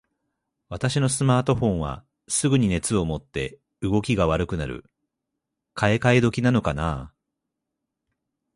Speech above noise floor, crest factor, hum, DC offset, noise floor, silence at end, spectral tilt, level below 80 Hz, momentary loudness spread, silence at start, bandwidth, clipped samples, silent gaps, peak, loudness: 60 dB; 22 dB; none; under 0.1%; -82 dBFS; 1.45 s; -5.5 dB/octave; -42 dBFS; 14 LU; 0.7 s; 11.5 kHz; under 0.1%; none; -4 dBFS; -23 LUFS